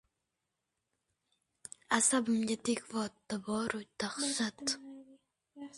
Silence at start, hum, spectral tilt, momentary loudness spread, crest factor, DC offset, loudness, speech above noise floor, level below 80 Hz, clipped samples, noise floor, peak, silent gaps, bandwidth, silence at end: 1.9 s; none; -2.5 dB/octave; 23 LU; 24 dB; under 0.1%; -34 LUFS; 52 dB; -74 dBFS; under 0.1%; -87 dBFS; -14 dBFS; none; 11.5 kHz; 0 s